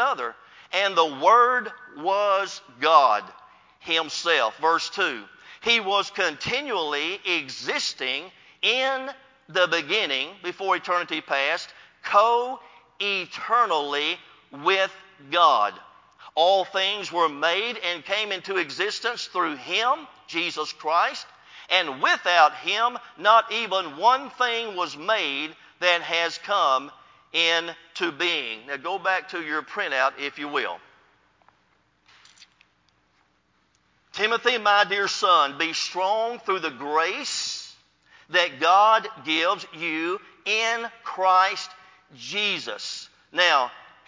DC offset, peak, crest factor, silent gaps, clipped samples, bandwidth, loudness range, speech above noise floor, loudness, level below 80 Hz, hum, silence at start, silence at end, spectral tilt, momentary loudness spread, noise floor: under 0.1%; -2 dBFS; 22 dB; none; under 0.1%; 7.6 kHz; 4 LU; 43 dB; -23 LUFS; -74 dBFS; none; 0 s; 0.25 s; -1.5 dB/octave; 12 LU; -67 dBFS